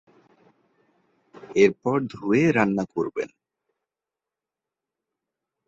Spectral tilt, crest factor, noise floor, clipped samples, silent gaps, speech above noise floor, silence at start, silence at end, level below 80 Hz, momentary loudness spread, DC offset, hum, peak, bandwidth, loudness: -7 dB/octave; 22 dB; -89 dBFS; under 0.1%; none; 67 dB; 1.5 s; 2.4 s; -64 dBFS; 10 LU; under 0.1%; none; -4 dBFS; 7.8 kHz; -23 LUFS